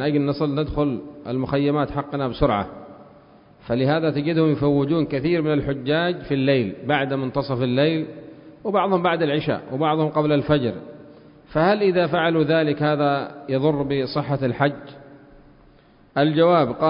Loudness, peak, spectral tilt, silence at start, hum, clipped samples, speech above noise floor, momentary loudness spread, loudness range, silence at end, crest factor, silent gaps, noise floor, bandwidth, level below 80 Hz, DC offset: -21 LUFS; -4 dBFS; -11.5 dB/octave; 0 s; none; under 0.1%; 32 dB; 8 LU; 3 LU; 0 s; 18 dB; none; -52 dBFS; 5.4 kHz; -46 dBFS; under 0.1%